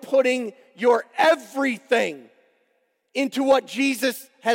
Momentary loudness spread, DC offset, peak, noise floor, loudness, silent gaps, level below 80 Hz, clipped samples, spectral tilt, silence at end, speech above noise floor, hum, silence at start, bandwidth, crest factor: 9 LU; under 0.1%; -6 dBFS; -70 dBFS; -22 LUFS; none; -74 dBFS; under 0.1%; -3 dB/octave; 0 s; 48 dB; none; 0 s; 16.5 kHz; 16 dB